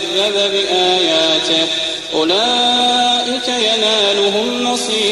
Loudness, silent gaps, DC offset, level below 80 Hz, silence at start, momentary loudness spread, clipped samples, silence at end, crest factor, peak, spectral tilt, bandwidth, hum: -13 LUFS; none; under 0.1%; -54 dBFS; 0 s; 5 LU; under 0.1%; 0 s; 12 dB; -2 dBFS; -1.5 dB/octave; 13 kHz; none